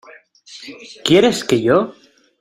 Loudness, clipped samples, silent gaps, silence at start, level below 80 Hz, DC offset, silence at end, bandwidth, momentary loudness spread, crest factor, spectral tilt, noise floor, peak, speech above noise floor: -15 LUFS; under 0.1%; none; 0.5 s; -54 dBFS; under 0.1%; 0.5 s; 15.5 kHz; 22 LU; 18 dB; -4.5 dB/octave; -44 dBFS; 0 dBFS; 28 dB